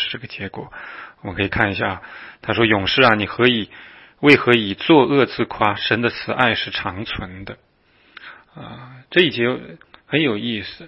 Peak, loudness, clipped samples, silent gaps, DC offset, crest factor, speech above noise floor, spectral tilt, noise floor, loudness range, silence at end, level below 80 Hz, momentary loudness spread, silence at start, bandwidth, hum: 0 dBFS; -18 LUFS; under 0.1%; none; under 0.1%; 20 dB; 37 dB; -7 dB/octave; -56 dBFS; 8 LU; 0 s; -48 dBFS; 20 LU; 0 s; 9.2 kHz; none